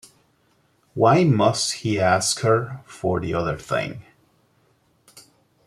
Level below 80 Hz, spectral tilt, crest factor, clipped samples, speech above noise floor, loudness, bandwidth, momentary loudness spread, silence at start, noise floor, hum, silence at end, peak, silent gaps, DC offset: -54 dBFS; -5 dB/octave; 20 dB; under 0.1%; 42 dB; -21 LUFS; 13.5 kHz; 15 LU; 0.95 s; -63 dBFS; none; 0.45 s; -2 dBFS; none; under 0.1%